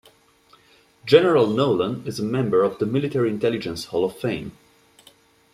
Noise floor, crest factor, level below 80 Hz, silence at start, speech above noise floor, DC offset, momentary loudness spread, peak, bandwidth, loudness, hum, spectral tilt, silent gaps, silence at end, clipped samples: -56 dBFS; 20 dB; -60 dBFS; 1.05 s; 36 dB; under 0.1%; 11 LU; -2 dBFS; 14 kHz; -21 LUFS; none; -6.5 dB/octave; none; 1.05 s; under 0.1%